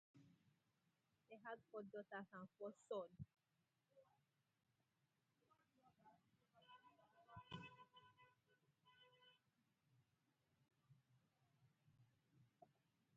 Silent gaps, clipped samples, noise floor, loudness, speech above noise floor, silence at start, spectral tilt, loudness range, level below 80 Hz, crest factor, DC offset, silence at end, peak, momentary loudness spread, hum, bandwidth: none; under 0.1%; -88 dBFS; -57 LUFS; 32 dB; 0.15 s; -4 dB/octave; 9 LU; -88 dBFS; 24 dB; under 0.1%; 0 s; -40 dBFS; 15 LU; none; 4.3 kHz